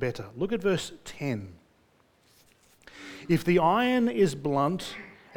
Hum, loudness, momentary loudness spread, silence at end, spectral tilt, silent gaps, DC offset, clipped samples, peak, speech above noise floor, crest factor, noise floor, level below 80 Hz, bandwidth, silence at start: none; -27 LUFS; 20 LU; 0.25 s; -6 dB/octave; none; under 0.1%; under 0.1%; -10 dBFS; 38 dB; 18 dB; -64 dBFS; -56 dBFS; 19 kHz; 0 s